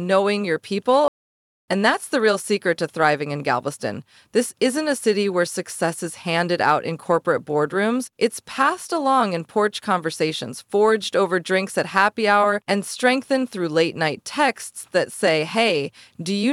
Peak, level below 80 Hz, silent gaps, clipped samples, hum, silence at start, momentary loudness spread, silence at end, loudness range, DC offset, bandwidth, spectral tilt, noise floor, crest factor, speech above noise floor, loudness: -2 dBFS; -72 dBFS; 1.08-1.68 s; under 0.1%; none; 0 s; 6 LU; 0 s; 2 LU; under 0.1%; 15.5 kHz; -4 dB/octave; under -90 dBFS; 18 dB; over 69 dB; -21 LUFS